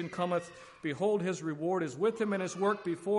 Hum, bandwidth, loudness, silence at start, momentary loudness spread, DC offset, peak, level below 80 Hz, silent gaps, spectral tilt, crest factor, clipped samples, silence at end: none; 11.5 kHz; -33 LUFS; 0 s; 6 LU; under 0.1%; -18 dBFS; -74 dBFS; none; -6 dB/octave; 14 dB; under 0.1%; 0 s